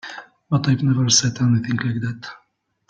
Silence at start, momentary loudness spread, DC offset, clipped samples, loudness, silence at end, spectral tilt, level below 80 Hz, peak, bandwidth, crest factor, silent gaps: 0.05 s; 20 LU; under 0.1%; under 0.1%; -19 LUFS; 0.55 s; -4 dB/octave; -54 dBFS; -2 dBFS; 9.4 kHz; 18 dB; none